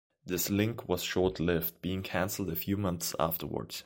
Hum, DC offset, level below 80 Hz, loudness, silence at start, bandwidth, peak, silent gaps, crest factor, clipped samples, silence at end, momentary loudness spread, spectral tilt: none; under 0.1%; -54 dBFS; -32 LUFS; 0.25 s; 17 kHz; -12 dBFS; none; 20 dB; under 0.1%; 0.05 s; 5 LU; -4.5 dB/octave